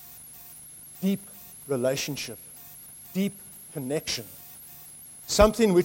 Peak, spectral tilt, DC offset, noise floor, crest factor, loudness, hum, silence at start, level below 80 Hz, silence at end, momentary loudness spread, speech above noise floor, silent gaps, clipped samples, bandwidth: -4 dBFS; -4.5 dB/octave; under 0.1%; -46 dBFS; 24 dB; -27 LUFS; none; 0 s; -44 dBFS; 0 s; 22 LU; 21 dB; none; under 0.1%; 16.5 kHz